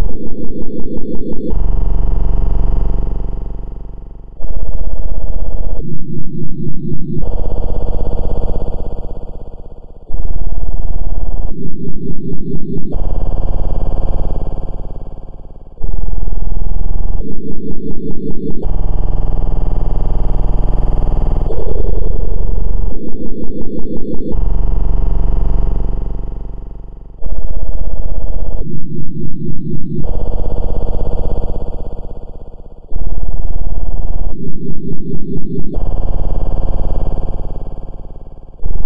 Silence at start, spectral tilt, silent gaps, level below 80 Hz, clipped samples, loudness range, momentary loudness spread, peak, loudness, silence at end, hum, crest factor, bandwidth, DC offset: 0 s; -11 dB/octave; none; -16 dBFS; 0.2%; 5 LU; 12 LU; 0 dBFS; -23 LUFS; 0 s; none; 6 dB; 1.5 kHz; 40%